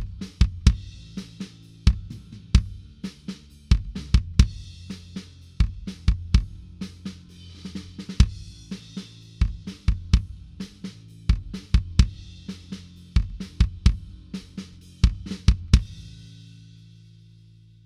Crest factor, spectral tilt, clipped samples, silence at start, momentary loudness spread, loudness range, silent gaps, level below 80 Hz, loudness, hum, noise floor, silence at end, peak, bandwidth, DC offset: 24 dB; -6 dB/octave; under 0.1%; 0 s; 18 LU; 4 LU; none; -26 dBFS; -26 LUFS; none; -51 dBFS; 1.75 s; -2 dBFS; 11 kHz; under 0.1%